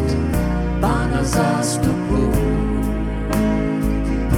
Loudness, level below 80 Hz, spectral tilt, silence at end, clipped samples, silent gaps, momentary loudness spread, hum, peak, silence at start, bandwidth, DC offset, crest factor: -20 LUFS; -24 dBFS; -6.5 dB/octave; 0 s; under 0.1%; none; 3 LU; none; -4 dBFS; 0 s; 17 kHz; under 0.1%; 14 dB